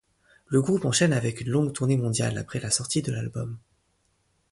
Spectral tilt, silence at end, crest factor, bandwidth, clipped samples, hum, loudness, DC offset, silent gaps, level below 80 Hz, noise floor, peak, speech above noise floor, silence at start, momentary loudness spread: -5 dB/octave; 0.95 s; 20 dB; 11.5 kHz; under 0.1%; none; -26 LUFS; under 0.1%; none; -56 dBFS; -70 dBFS; -8 dBFS; 45 dB; 0.5 s; 11 LU